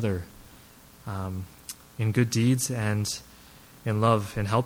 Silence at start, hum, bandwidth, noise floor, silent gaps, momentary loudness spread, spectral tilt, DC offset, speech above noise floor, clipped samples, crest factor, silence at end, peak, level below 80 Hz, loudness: 0 s; none; 17 kHz; -52 dBFS; none; 17 LU; -5.5 dB/octave; under 0.1%; 26 dB; under 0.1%; 18 dB; 0 s; -10 dBFS; -54 dBFS; -27 LUFS